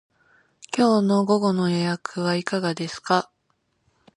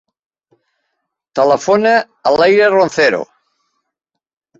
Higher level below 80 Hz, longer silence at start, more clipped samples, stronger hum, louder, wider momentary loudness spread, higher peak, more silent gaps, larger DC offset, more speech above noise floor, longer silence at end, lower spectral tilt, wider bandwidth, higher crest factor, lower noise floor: second, -68 dBFS vs -58 dBFS; second, 0.7 s vs 1.35 s; neither; neither; second, -23 LUFS vs -12 LUFS; second, 8 LU vs 11 LU; second, -4 dBFS vs 0 dBFS; neither; neither; second, 49 dB vs 68 dB; second, 0.95 s vs 1.35 s; first, -6 dB/octave vs -4.5 dB/octave; first, 11 kHz vs 7.8 kHz; about the same, 20 dB vs 16 dB; second, -71 dBFS vs -79 dBFS